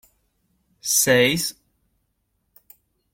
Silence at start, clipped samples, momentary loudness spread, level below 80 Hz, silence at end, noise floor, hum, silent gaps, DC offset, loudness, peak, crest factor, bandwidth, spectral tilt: 0.85 s; under 0.1%; 13 LU; -58 dBFS; 1.6 s; -72 dBFS; none; none; under 0.1%; -19 LUFS; -4 dBFS; 20 dB; 16.5 kHz; -2.5 dB/octave